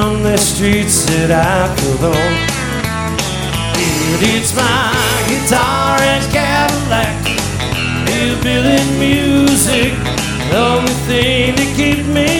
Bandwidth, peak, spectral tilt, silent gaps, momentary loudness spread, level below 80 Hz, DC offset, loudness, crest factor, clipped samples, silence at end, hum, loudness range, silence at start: 19 kHz; 0 dBFS; -4 dB/octave; none; 5 LU; -28 dBFS; under 0.1%; -13 LUFS; 14 dB; under 0.1%; 0 s; none; 2 LU; 0 s